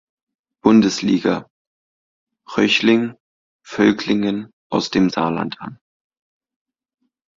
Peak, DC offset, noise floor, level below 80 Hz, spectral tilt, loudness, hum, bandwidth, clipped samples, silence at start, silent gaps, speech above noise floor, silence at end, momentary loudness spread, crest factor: 0 dBFS; under 0.1%; under -90 dBFS; -56 dBFS; -5 dB/octave; -18 LUFS; none; 7.6 kHz; under 0.1%; 0.65 s; 1.50-2.27 s, 3.20-3.59 s, 4.53-4.70 s; over 73 dB; 1.65 s; 14 LU; 20 dB